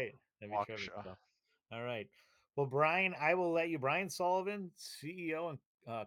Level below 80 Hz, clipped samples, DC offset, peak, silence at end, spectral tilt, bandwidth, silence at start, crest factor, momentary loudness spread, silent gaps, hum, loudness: -82 dBFS; under 0.1%; under 0.1%; -18 dBFS; 0 s; -5 dB/octave; 18 kHz; 0 s; 20 dB; 17 LU; 5.66-5.78 s; none; -37 LUFS